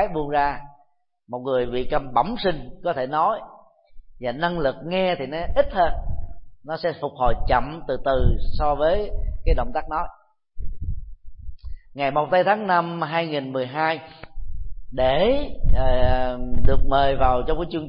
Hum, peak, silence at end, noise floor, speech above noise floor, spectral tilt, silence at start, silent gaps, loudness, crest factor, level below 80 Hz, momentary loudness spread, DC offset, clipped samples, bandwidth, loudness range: none; -2 dBFS; 0 s; -62 dBFS; 43 dB; -10.5 dB/octave; 0 s; none; -23 LUFS; 18 dB; -28 dBFS; 18 LU; under 0.1%; under 0.1%; 5.2 kHz; 3 LU